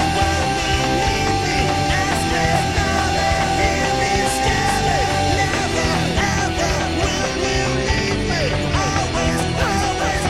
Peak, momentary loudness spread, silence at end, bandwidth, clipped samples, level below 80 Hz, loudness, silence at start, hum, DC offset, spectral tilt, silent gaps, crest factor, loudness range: -4 dBFS; 2 LU; 0 s; 16 kHz; under 0.1%; -28 dBFS; -18 LUFS; 0 s; none; 0.7%; -4 dB/octave; none; 14 dB; 1 LU